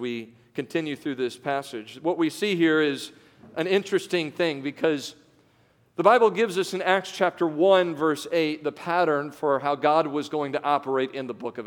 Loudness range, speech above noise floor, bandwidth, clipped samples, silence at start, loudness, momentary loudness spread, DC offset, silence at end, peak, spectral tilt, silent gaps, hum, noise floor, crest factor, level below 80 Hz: 4 LU; 37 dB; 18 kHz; under 0.1%; 0 s; -25 LUFS; 13 LU; under 0.1%; 0 s; -4 dBFS; -5 dB/octave; none; none; -62 dBFS; 22 dB; -76 dBFS